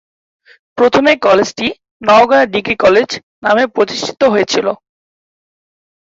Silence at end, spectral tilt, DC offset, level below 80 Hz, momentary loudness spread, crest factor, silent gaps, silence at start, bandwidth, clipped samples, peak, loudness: 1.35 s; -4 dB/octave; under 0.1%; -52 dBFS; 10 LU; 14 dB; 1.91-2.00 s, 3.23-3.42 s; 0.75 s; 7.8 kHz; under 0.1%; 0 dBFS; -12 LUFS